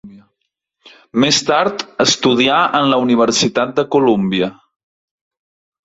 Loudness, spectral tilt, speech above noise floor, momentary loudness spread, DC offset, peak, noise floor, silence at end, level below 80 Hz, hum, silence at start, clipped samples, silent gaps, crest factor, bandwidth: -14 LUFS; -3.5 dB/octave; 60 dB; 6 LU; under 0.1%; 0 dBFS; -74 dBFS; 1.3 s; -56 dBFS; none; 0.05 s; under 0.1%; none; 16 dB; 8 kHz